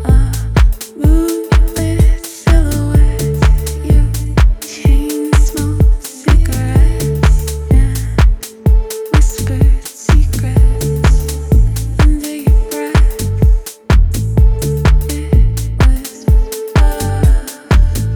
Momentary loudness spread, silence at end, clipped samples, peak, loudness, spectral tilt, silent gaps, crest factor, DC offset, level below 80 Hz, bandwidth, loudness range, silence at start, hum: 3 LU; 0 s; under 0.1%; 0 dBFS; -14 LUFS; -6 dB/octave; none; 10 dB; under 0.1%; -12 dBFS; 18.5 kHz; 1 LU; 0 s; none